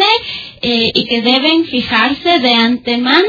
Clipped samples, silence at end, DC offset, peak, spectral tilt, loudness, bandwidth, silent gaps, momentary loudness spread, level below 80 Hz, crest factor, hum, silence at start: under 0.1%; 0 s; under 0.1%; 0 dBFS; -4.5 dB/octave; -12 LUFS; 5.4 kHz; none; 5 LU; -48 dBFS; 12 dB; none; 0 s